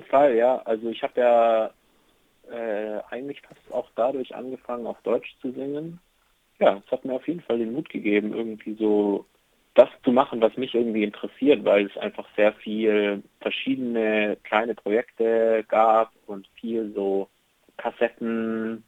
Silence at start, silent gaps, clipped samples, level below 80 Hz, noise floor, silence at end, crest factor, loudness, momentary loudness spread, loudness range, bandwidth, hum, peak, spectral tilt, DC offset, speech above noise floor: 0 s; none; under 0.1%; -72 dBFS; -65 dBFS; 0.1 s; 22 dB; -24 LUFS; 14 LU; 8 LU; 7.8 kHz; none; -2 dBFS; -7 dB/octave; under 0.1%; 42 dB